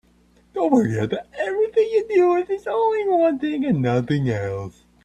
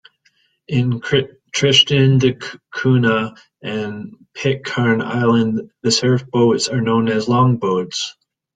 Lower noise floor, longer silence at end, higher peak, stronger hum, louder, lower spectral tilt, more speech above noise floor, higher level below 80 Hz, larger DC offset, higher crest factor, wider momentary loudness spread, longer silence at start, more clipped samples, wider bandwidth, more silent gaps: second, -57 dBFS vs -61 dBFS; about the same, 0.35 s vs 0.45 s; about the same, -4 dBFS vs -2 dBFS; first, 60 Hz at -50 dBFS vs none; second, -21 LUFS vs -17 LUFS; first, -8 dB/octave vs -5 dB/octave; second, 37 dB vs 44 dB; about the same, -56 dBFS vs -54 dBFS; neither; about the same, 16 dB vs 16 dB; second, 9 LU vs 14 LU; second, 0.55 s vs 0.7 s; neither; about the same, 9.2 kHz vs 9.4 kHz; neither